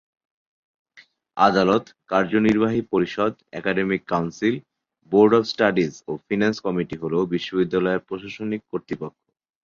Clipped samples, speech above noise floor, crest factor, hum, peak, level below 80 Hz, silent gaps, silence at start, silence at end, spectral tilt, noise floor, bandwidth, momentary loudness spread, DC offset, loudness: under 0.1%; 33 dB; 20 dB; none; -2 dBFS; -58 dBFS; none; 0.95 s; 0.55 s; -6.5 dB/octave; -54 dBFS; 7.4 kHz; 13 LU; under 0.1%; -22 LUFS